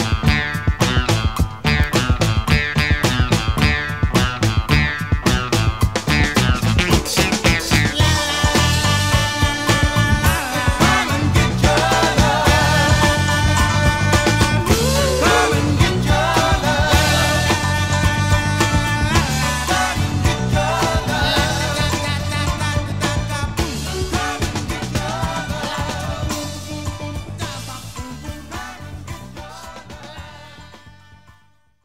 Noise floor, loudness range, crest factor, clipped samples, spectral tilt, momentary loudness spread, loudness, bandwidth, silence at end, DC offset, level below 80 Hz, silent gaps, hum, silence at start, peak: -57 dBFS; 12 LU; 18 dB; under 0.1%; -4.5 dB/octave; 13 LU; -17 LUFS; 16.5 kHz; 0.95 s; 0.6%; -26 dBFS; none; none; 0 s; 0 dBFS